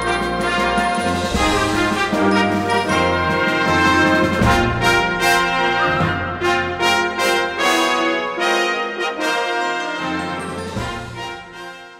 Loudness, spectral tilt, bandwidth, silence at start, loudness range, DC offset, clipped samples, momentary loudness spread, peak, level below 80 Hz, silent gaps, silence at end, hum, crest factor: -17 LUFS; -4 dB/octave; 16 kHz; 0 s; 5 LU; under 0.1%; under 0.1%; 10 LU; 0 dBFS; -36 dBFS; none; 0 s; none; 18 dB